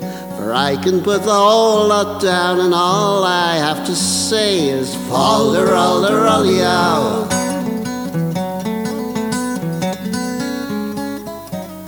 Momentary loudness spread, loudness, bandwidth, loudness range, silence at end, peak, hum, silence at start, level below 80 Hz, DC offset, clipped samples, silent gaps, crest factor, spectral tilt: 10 LU; -16 LUFS; over 20 kHz; 7 LU; 0 s; 0 dBFS; none; 0 s; -52 dBFS; under 0.1%; under 0.1%; none; 16 dB; -4 dB/octave